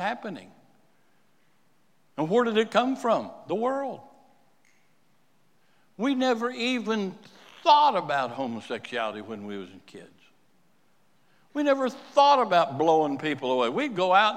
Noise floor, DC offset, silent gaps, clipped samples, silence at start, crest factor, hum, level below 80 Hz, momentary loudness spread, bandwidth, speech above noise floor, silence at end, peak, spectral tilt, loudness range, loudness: -68 dBFS; under 0.1%; none; under 0.1%; 0 s; 20 dB; none; -84 dBFS; 17 LU; 13 kHz; 43 dB; 0 s; -6 dBFS; -5 dB/octave; 8 LU; -25 LUFS